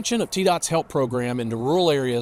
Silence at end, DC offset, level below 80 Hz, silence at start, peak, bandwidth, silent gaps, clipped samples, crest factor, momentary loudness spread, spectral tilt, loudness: 0 s; under 0.1%; -56 dBFS; 0 s; -8 dBFS; 16 kHz; none; under 0.1%; 14 dB; 6 LU; -4.5 dB/octave; -22 LUFS